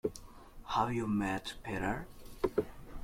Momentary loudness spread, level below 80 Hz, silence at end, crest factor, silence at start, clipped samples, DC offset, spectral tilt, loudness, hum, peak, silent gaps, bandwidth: 19 LU; -52 dBFS; 0 s; 20 dB; 0.05 s; under 0.1%; under 0.1%; -6 dB/octave; -36 LUFS; none; -16 dBFS; none; 16.5 kHz